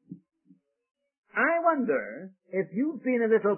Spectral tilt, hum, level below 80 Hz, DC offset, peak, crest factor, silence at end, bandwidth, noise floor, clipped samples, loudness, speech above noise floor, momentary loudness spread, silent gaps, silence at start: -11 dB/octave; none; -80 dBFS; under 0.1%; -12 dBFS; 18 dB; 0 s; 3.2 kHz; -64 dBFS; under 0.1%; -27 LUFS; 36 dB; 11 LU; 0.91-0.95 s, 1.18-1.23 s; 0.1 s